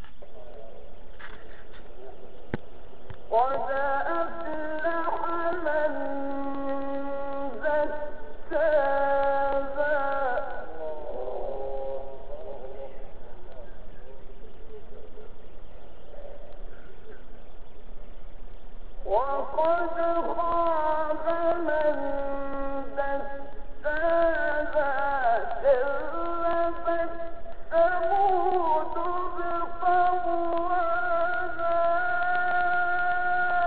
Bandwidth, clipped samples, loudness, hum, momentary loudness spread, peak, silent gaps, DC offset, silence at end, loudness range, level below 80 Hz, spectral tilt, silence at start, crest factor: 4.7 kHz; under 0.1%; -27 LUFS; none; 23 LU; -10 dBFS; none; 4%; 0 s; 19 LU; -44 dBFS; -3.5 dB/octave; 0 s; 18 dB